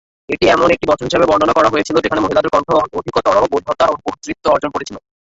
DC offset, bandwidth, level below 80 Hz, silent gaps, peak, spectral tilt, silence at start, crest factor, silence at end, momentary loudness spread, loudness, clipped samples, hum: under 0.1%; 8 kHz; -42 dBFS; none; 0 dBFS; -5 dB/octave; 0.3 s; 14 dB; 0.25 s; 11 LU; -15 LUFS; under 0.1%; none